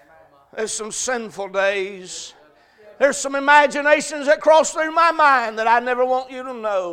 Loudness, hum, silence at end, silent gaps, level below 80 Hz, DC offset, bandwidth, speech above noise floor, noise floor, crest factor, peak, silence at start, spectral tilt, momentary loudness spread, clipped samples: -18 LUFS; none; 0 s; none; -60 dBFS; under 0.1%; 15 kHz; 33 dB; -51 dBFS; 20 dB; 0 dBFS; 0.55 s; -1.5 dB/octave; 15 LU; under 0.1%